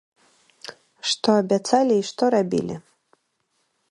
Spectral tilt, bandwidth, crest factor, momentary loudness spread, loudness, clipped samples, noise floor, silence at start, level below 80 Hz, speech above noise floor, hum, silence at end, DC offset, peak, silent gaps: -4.5 dB/octave; 11.5 kHz; 20 dB; 21 LU; -21 LUFS; under 0.1%; -71 dBFS; 0.7 s; -66 dBFS; 51 dB; none; 1.1 s; under 0.1%; -4 dBFS; none